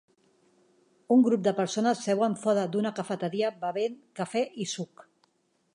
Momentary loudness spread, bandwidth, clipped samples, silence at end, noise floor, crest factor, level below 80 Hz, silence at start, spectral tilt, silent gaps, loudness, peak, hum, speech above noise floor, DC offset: 11 LU; 11 kHz; under 0.1%; 0.9 s; -72 dBFS; 16 dB; -82 dBFS; 1.1 s; -5.5 dB/octave; none; -28 LUFS; -12 dBFS; none; 44 dB; under 0.1%